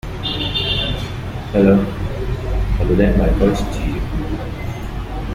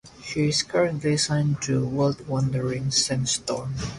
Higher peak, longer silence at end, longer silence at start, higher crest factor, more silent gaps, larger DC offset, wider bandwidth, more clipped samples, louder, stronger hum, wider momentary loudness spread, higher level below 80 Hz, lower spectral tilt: first, -2 dBFS vs -8 dBFS; about the same, 0 s vs 0 s; about the same, 0.05 s vs 0.05 s; about the same, 16 dB vs 16 dB; neither; neither; first, 15.5 kHz vs 11.5 kHz; neither; first, -19 LUFS vs -24 LUFS; neither; first, 12 LU vs 4 LU; first, -24 dBFS vs -50 dBFS; first, -7 dB/octave vs -4.5 dB/octave